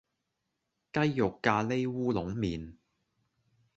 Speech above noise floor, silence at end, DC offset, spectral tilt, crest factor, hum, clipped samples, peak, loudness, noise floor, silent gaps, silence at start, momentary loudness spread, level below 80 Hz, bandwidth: 53 dB; 1.05 s; under 0.1%; -7 dB/octave; 24 dB; none; under 0.1%; -8 dBFS; -31 LUFS; -83 dBFS; none; 0.95 s; 8 LU; -56 dBFS; 8 kHz